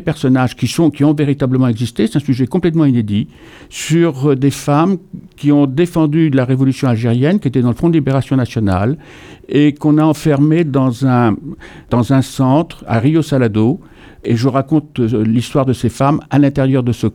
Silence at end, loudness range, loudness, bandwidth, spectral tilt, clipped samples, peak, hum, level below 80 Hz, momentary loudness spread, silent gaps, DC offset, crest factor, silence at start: 0.05 s; 1 LU; -14 LUFS; 15.5 kHz; -7.5 dB/octave; under 0.1%; 0 dBFS; none; -42 dBFS; 6 LU; none; under 0.1%; 12 dB; 0 s